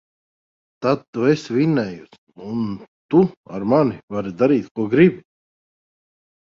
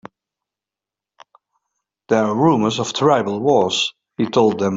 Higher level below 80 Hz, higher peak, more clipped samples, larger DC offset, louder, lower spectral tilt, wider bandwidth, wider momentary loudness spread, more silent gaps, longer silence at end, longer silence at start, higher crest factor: about the same, -58 dBFS vs -60 dBFS; about the same, -2 dBFS vs -2 dBFS; neither; neither; second, -20 LUFS vs -17 LUFS; first, -8 dB/octave vs -5 dB/octave; about the same, 7.6 kHz vs 7.8 kHz; first, 13 LU vs 5 LU; first, 1.08-1.13 s, 2.18-2.27 s, 2.88-3.09 s, 3.37-3.44 s, 4.03-4.08 s, 4.71-4.75 s vs none; first, 1.4 s vs 0 s; second, 0.8 s vs 2.1 s; about the same, 18 dB vs 18 dB